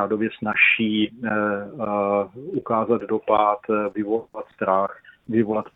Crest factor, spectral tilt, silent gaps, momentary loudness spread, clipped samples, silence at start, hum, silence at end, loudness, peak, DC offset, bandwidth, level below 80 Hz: 20 dB; -8.5 dB/octave; none; 11 LU; under 0.1%; 0 s; none; 0.05 s; -22 LUFS; -4 dBFS; under 0.1%; 4 kHz; -62 dBFS